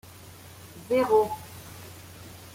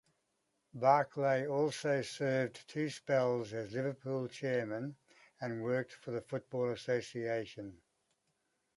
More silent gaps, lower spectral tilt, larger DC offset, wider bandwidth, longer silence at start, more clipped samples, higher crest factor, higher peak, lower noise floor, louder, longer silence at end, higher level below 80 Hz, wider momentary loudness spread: neither; about the same, -5 dB/octave vs -6 dB/octave; neither; first, 16.5 kHz vs 11.5 kHz; second, 0.25 s vs 0.75 s; neither; about the same, 18 dB vs 22 dB; first, -10 dBFS vs -14 dBFS; second, -47 dBFS vs -82 dBFS; first, -25 LUFS vs -36 LUFS; second, 0.1 s vs 1 s; first, -62 dBFS vs -76 dBFS; first, 24 LU vs 11 LU